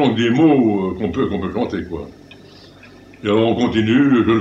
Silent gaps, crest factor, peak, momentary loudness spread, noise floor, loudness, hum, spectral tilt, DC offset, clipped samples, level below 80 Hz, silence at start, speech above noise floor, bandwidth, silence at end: none; 14 dB; -2 dBFS; 13 LU; -42 dBFS; -17 LUFS; none; -7.5 dB/octave; under 0.1%; under 0.1%; -46 dBFS; 0 s; 26 dB; 7.8 kHz; 0 s